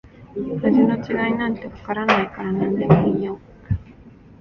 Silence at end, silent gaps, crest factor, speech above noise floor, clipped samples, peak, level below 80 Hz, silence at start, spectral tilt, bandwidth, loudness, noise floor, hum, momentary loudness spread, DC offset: 0.3 s; none; 20 dB; 25 dB; under 0.1%; 0 dBFS; -42 dBFS; 0.2 s; -8.5 dB/octave; 6.8 kHz; -21 LUFS; -45 dBFS; none; 13 LU; under 0.1%